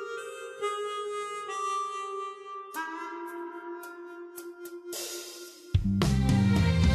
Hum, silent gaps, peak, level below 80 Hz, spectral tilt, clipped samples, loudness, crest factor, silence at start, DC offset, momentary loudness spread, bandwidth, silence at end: none; none; -10 dBFS; -42 dBFS; -6 dB/octave; under 0.1%; -31 LUFS; 20 dB; 0 s; under 0.1%; 18 LU; 14 kHz; 0 s